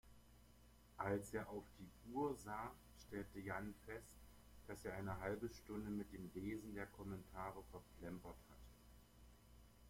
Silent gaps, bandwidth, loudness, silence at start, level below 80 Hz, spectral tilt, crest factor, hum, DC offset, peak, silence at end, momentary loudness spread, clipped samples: none; 16.5 kHz; -50 LUFS; 0.05 s; -66 dBFS; -6.5 dB/octave; 22 dB; 60 Hz at -70 dBFS; under 0.1%; -30 dBFS; 0 s; 22 LU; under 0.1%